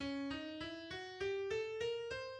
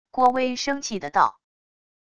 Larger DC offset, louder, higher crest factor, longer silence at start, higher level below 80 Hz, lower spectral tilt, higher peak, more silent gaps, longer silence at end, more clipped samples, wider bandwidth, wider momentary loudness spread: neither; second, -43 LUFS vs -23 LUFS; second, 12 dB vs 20 dB; second, 0 s vs 0.15 s; about the same, -66 dBFS vs -62 dBFS; first, -4.5 dB/octave vs -3 dB/octave; second, -30 dBFS vs -4 dBFS; neither; second, 0 s vs 0.75 s; neither; about the same, 10 kHz vs 10 kHz; about the same, 6 LU vs 6 LU